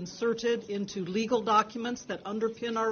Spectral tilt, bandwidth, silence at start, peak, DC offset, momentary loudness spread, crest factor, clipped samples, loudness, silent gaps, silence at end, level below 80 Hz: -4.5 dB/octave; 6.8 kHz; 0 s; -12 dBFS; under 0.1%; 10 LU; 18 dB; under 0.1%; -30 LUFS; none; 0 s; -68 dBFS